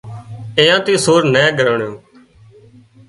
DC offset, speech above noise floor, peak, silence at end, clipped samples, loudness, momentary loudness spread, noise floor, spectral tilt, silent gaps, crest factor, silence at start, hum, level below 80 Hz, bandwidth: under 0.1%; 32 dB; 0 dBFS; 1.1 s; under 0.1%; -13 LUFS; 16 LU; -45 dBFS; -4 dB/octave; none; 16 dB; 0.05 s; none; -54 dBFS; 11.5 kHz